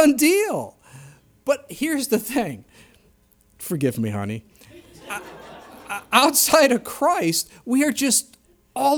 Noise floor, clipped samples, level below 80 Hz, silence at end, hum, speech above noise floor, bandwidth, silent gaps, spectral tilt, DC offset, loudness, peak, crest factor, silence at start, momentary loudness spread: -58 dBFS; under 0.1%; -60 dBFS; 0 s; none; 38 dB; over 20 kHz; none; -3 dB/octave; under 0.1%; -20 LUFS; -2 dBFS; 22 dB; 0 s; 20 LU